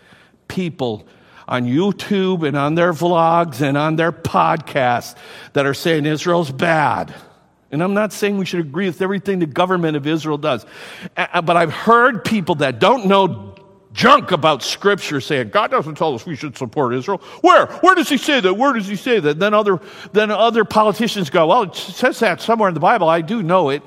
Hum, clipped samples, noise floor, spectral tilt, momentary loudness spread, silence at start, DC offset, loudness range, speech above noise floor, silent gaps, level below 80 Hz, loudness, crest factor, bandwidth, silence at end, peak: none; under 0.1%; -43 dBFS; -5.5 dB/octave; 11 LU; 0.5 s; under 0.1%; 4 LU; 27 dB; none; -58 dBFS; -16 LUFS; 16 dB; 16 kHz; 0.05 s; 0 dBFS